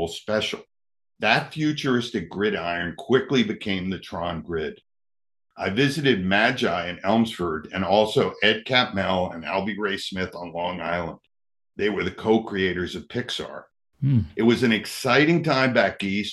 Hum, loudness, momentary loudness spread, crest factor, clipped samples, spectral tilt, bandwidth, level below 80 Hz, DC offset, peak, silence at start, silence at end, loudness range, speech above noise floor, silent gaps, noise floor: none; -23 LUFS; 10 LU; 22 dB; under 0.1%; -5.5 dB/octave; 12.5 kHz; -58 dBFS; under 0.1%; -2 dBFS; 0 s; 0 s; 5 LU; over 67 dB; none; under -90 dBFS